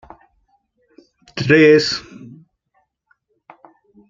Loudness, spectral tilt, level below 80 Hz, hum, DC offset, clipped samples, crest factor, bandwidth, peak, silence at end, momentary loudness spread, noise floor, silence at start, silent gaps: -14 LUFS; -5.5 dB/octave; -58 dBFS; none; under 0.1%; under 0.1%; 18 dB; 7.6 kHz; -2 dBFS; 2.1 s; 22 LU; -66 dBFS; 1.35 s; none